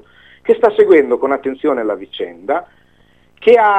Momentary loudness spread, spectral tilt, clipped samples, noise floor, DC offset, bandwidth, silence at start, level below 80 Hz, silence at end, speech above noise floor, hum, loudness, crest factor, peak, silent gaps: 13 LU; -6 dB/octave; under 0.1%; -53 dBFS; 0.2%; 4.9 kHz; 0.45 s; -58 dBFS; 0 s; 40 dB; none; -15 LUFS; 14 dB; 0 dBFS; none